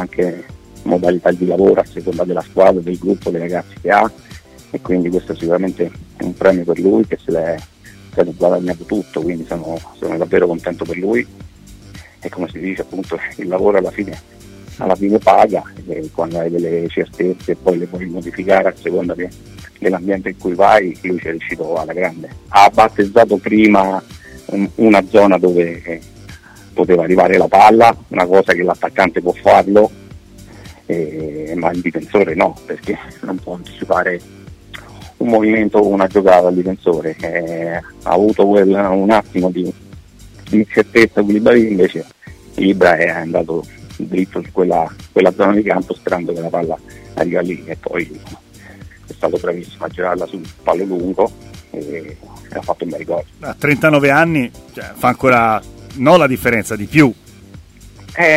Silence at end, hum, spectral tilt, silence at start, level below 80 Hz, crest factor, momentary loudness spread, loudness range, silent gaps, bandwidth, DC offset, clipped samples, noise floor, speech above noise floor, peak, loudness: 0 s; none; -6.5 dB/octave; 0 s; -44 dBFS; 16 dB; 15 LU; 8 LU; none; 16 kHz; under 0.1%; under 0.1%; -39 dBFS; 24 dB; 0 dBFS; -15 LUFS